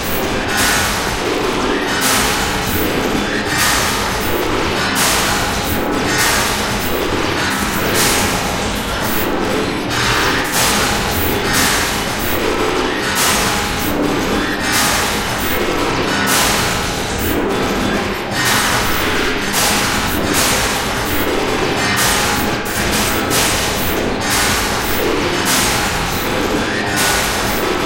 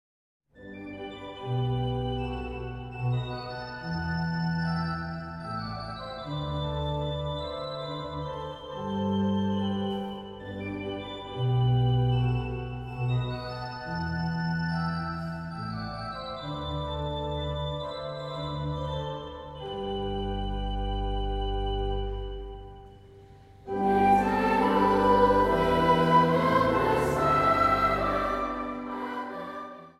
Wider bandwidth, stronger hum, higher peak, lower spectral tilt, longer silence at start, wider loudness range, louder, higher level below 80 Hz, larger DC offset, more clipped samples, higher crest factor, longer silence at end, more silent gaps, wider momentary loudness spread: first, 17 kHz vs 13.5 kHz; neither; first, 0 dBFS vs -8 dBFS; second, -2.5 dB/octave vs -7.5 dB/octave; second, 0 s vs 0.55 s; second, 1 LU vs 11 LU; first, -15 LUFS vs -29 LUFS; first, -30 dBFS vs -40 dBFS; neither; neither; about the same, 16 dB vs 20 dB; about the same, 0 s vs 0.1 s; neither; second, 4 LU vs 15 LU